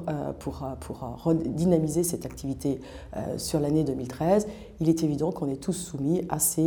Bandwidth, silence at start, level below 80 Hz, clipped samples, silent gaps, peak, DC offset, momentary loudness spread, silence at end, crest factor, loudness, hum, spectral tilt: over 20 kHz; 0 s; -48 dBFS; under 0.1%; none; -10 dBFS; under 0.1%; 12 LU; 0 s; 18 dB; -28 LUFS; none; -6 dB/octave